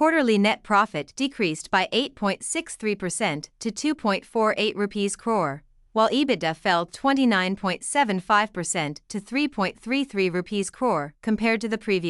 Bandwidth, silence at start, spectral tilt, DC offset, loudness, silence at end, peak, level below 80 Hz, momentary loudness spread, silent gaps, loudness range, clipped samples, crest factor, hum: 12 kHz; 0 s; -4 dB/octave; under 0.1%; -24 LUFS; 0 s; -8 dBFS; -58 dBFS; 7 LU; none; 3 LU; under 0.1%; 18 dB; none